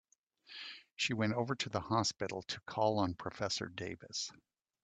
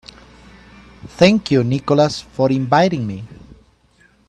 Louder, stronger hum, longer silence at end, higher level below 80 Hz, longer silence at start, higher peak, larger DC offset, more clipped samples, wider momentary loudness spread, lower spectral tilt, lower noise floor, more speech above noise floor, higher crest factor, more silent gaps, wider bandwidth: second, -37 LUFS vs -16 LUFS; neither; second, 0.5 s vs 0.95 s; second, -70 dBFS vs -48 dBFS; second, 0.5 s vs 1.05 s; second, -18 dBFS vs 0 dBFS; neither; neither; second, 14 LU vs 17 LU; second, -4 dB/octave vs -6.5 dB/octave; first, -62 dBFS vs -54 dBFS; second, 25 dB vs 39 dB; about the same, 20 dB vs 18 dB; first, 0.92-0.96 s vs none; second, 9 kHz vs 11 kHz